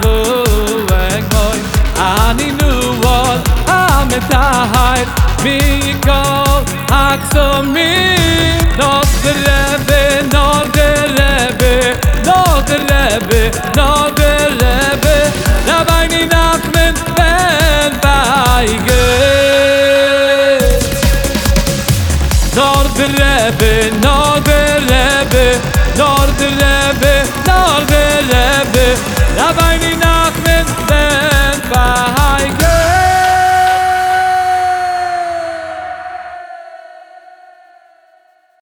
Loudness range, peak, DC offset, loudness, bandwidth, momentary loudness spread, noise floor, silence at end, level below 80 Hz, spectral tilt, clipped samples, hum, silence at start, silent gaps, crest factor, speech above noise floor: 2 LU; 0 dBFS; under 0.1%; -11 LUFS; over 20 kHz; 4 LU; -50 dBFS; 1.45 s; -16 dBFS; -4 dB/octave; under 0.1%; none; 0 s; none; 10 dB; 40 dB